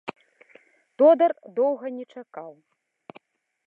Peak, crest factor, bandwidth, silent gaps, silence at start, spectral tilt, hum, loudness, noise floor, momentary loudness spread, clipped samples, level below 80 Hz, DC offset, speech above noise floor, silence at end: -8 dBFS; 18 dB; 4.6 kHz; none; 0.05 s; -7.5 dB/octave; none; -21 LUFS; -57 dBFS; 24 LU; under 0.1%; -88 dBFS; under 0.1%; 35 dB; 1.15 s